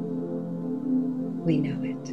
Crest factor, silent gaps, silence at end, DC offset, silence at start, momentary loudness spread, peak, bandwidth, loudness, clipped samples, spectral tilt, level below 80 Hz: 16 dB; none; 0 s; 0.2%; 0 s; 6 LU; -12 dBFS; 6.4 kHz; -29 LUFS; under 0.1%; -8.5 dB/octave; -62 dBFS